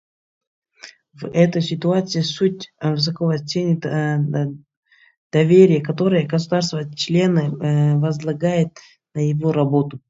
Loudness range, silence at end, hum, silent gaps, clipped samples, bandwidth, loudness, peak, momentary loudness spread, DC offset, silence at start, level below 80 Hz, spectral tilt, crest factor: 4 LU; 0.1 s; none; 4.77-4.83 s, 5.17-5.30 s; under 0.1%; 7.8 kHz; -19 LUFS; -2 dBFS; 9 LU; under 0.1%; 0.85 s; -62 dBFS; -7 dB/octave; 18 dB